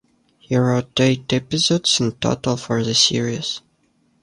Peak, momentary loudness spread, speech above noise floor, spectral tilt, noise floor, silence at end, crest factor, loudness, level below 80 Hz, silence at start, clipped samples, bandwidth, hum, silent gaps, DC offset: -2 dBFS; 8 LU; 43 dB; -4 dB/octave; -62 dBFS; 0.65 s; 18 dB; -19 LUFS; -52 dBFS; 0.5 s; under 0.1%; 11 kHz; none; none; under 0.1%